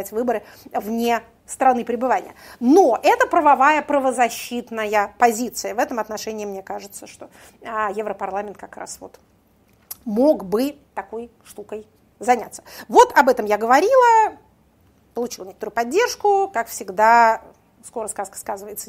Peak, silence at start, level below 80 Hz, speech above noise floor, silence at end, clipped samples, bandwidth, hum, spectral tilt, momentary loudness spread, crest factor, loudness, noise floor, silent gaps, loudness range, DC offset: 0 dBFS; 0 s; -58 dBFS; 38 dB; 0.05 s; under 0.1%; 16 kHz; none; -3.5 dB/octave; 20 LU; 20 dB; -19 LUFS; -57 dBFS; none; 10 LU; under 0.1%